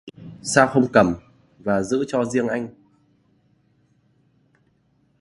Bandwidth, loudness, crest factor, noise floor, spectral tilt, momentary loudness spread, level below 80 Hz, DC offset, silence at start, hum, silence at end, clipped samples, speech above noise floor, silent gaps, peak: 11.5 kHz; -21 LUFS; 24 dB; -63 dBFS; -5 dB/octave; 16 LU; -54 dBFS; under 0.1%; 0.05 s; none; 2.5 s; under 0.1%; 44 dB; none; 0 dBFS